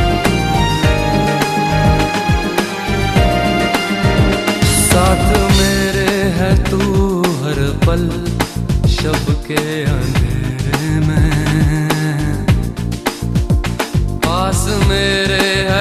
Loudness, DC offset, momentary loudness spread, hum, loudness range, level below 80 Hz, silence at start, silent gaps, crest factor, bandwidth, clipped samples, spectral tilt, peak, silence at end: -15 LUFS; under 0.1%; 6 LU; none; 4 LU; -22 dBFS; 0 s; none; 14 dB; 14.5 kHz; under 0.1%; -5 dB/octave; 0 dBFS; 0 s